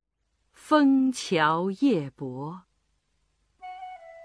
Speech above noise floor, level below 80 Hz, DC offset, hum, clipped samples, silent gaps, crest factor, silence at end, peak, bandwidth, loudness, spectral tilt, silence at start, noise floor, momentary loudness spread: 51 dB; -72 dBFS; under 0.1%; none; under 0.1%; none; 18 dB; 0 s; -8 dBFS; 11 kHz; -24 LUFS; -5.5 dB/octave; 0.65 s; -75 dBFS; 21 LU